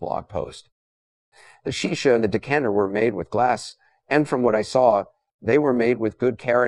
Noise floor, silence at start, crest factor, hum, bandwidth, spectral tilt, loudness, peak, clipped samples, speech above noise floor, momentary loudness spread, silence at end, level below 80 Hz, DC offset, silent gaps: under -90 dBFS; 0 s; 18 dB; none; 11.5 kHz; -5.5 dB/octave; -22 LUFS; -4 dBFS; under 0.1%; over 69 dB; 13 LU; 0 s; -56 dBFS; 0.1%; 0.72-1.32 s, 5.34-5.39 s